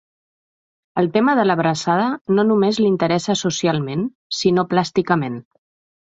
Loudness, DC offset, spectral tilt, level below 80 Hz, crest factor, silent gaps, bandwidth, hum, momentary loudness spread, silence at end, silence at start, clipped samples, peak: -19 LUFS; under 0.1%; -5.5 dB/octave; -58 dBFS; 16 dB; 2.21-2.25 s, 4.15-4.30 s; 8 kHz; none; 8 LU; 0.6 s; 0.95 s; under 0.1%; -2 dBFS